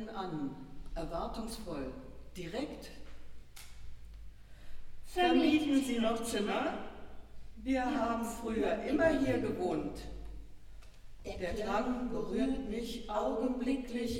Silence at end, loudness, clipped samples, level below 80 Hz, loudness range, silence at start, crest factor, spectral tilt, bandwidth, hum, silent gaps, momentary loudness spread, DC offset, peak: 0 s; -35 LUFS; under 0.1%; -50 dBFS; 11 LU; 0 s; 18 dB; -5 dB/octave; 16.5 kHz; none; none; 24 LU; under 0.1%; -16 dBFS